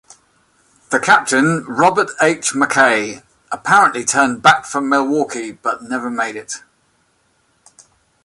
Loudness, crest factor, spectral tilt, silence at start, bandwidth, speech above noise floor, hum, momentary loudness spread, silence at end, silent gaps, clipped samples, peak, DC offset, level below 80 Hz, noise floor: -15 LUFS; 18 dB; -3 dB/octave; 0.9 s; 11.5 kHz; 45 dB; none; 13 LU; 1.65 s; none; under 0.1%; 0 dBFS; under 0.1%; -62 dBFS; -61 dBFS